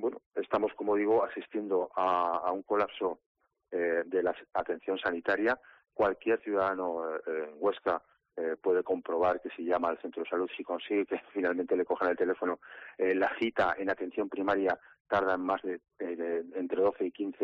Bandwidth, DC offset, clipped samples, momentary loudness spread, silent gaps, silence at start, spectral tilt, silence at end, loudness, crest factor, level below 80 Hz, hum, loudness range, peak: 6.2 kHz; under 0.1%; under 0.1%; 8 LU; 0.26-0.31 s, 3.26-3.35 s, 15.00-15.05 s; 0 s; -3 dB/octave; 0 s; -32 LUFS; 14 dB; -68 dBFS; none; 2 LU; -18 dBFS